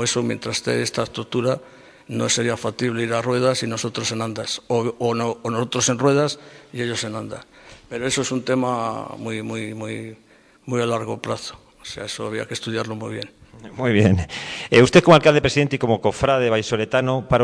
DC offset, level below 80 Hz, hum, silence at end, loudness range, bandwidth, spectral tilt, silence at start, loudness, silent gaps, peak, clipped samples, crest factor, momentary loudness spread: under 0.1%; -48 dBFS; none; 0 s; 11 LU; 11 kHz; -4.5 dB/octave; 0 s; -21 LUFS; none; -2 dBFS; under 0.1%; 20 dB; 14 LU